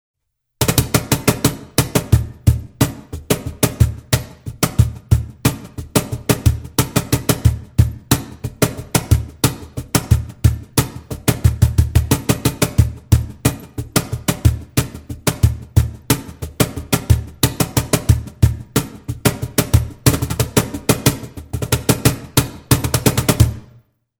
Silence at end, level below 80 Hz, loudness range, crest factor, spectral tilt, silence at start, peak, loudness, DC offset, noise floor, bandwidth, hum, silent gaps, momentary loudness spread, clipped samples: 0.6 s; -26 dBFS; 2 LU; 18 dB; -5 dB/octave; 0.6 s; 0 dBFS; -18 LUFS; under 0.1%; -50 dBFS; over 20 kHz; none; none; 6 LU; under 0.1%